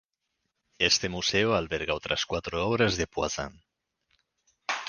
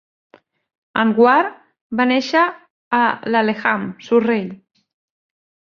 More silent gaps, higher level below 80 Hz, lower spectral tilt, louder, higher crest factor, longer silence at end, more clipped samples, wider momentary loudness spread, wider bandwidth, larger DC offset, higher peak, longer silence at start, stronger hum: second, none vs 1.81-1.90 s, 2.70-2.91 s; first, -50 dBFS vs -64 dBFS; second, -3 dB/octave vs -6 dB/octave; second, -27 LUFS vs -17 LUFS; first, 24 dB vs 18 dB; second, 0 s vs 1.25 s; neither; about the same, 10 LU vs 11 LU; first, 10.5 kHz vs 7 kHz; neither; second, -8 dBFS vs 0 dBFS; second, 0.8 s vs 0.95 s; neither